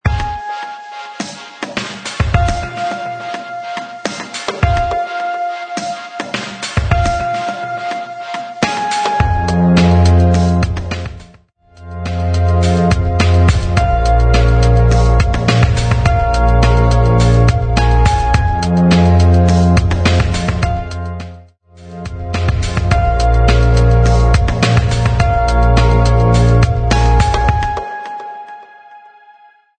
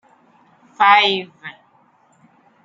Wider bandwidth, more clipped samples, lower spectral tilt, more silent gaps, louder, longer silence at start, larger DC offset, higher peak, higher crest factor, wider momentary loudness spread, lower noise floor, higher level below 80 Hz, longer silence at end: first, 9.4 kHz vs 7.6 kHz; neither; first, -6.5 dB/octave vs -3.5 dB/octave; neither; about the same, -14 LUFS vs -14 LUFS; second, 0.05 s vs 0.8 s; neither; about the same, 0 dBFS vs -2 dBFS; second, 12 dB vs 20 dB; second, 14 LU vs 25 LU; second, -46 dBFS vs -56 dBFS; first, -18 dBFS vs -78 dBFS; second, 0.8 s vs 1.15 s